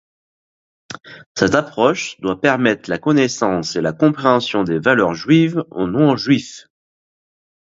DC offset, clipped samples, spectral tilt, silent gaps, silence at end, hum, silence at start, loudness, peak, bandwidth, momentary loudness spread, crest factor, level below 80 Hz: under 0.1%; under 0.1%; -5.5 dB/octave; 1.26-1.35 s; 1.15 s; none; 0.9 s; -17 LUFS; 0 dBFS; 8 kHz; 10 LU; 18 dB; -52 dBFS